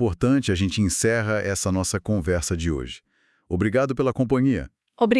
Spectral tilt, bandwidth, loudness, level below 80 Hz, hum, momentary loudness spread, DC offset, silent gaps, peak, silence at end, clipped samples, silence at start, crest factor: -5.5 dB/octave; 12 kHz; -23 LUFS; -44 dBFS; none; 9 LU; under 0.1%; none; -4 dBFS; 0 s; under 0.1%; 0 s; 18 dB